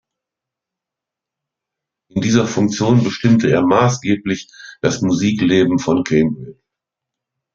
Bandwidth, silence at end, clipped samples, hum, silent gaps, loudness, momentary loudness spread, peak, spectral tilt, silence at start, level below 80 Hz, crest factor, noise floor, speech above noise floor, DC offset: 7.6 kHz; 1 s; under 0.1%; none; none; -16 LUFS; 9 LU; -2 dBFS; -6 dB/octave; 2.15 s; -52 dBFS; 16 dB; -85 dBFS; 70 dB; under 0.1%